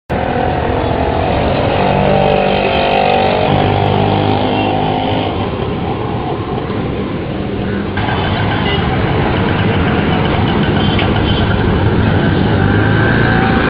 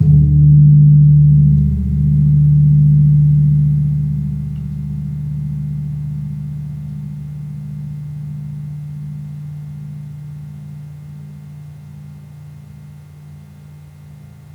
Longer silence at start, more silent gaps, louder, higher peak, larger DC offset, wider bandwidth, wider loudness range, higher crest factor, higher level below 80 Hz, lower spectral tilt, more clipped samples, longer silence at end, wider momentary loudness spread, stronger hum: about the same, 0.1 s vs 0 s; neither; about the same, -14 LUFS vs -13 LUFS; about the same, 0 dBFS vs -2 dBFS; neither; first, 5.2 kHz vs 0.9 kHz; second, 5 LU vs 24 LU; about the same, 12 dB vs 14 dB; about the same, -26 dBFS vs -30 dBFS; second, -9.5 dB/octave vs -12 dB/octave; neither; second, 0 s vs 0.35 s; second, 7 LU vs 25 LU; neither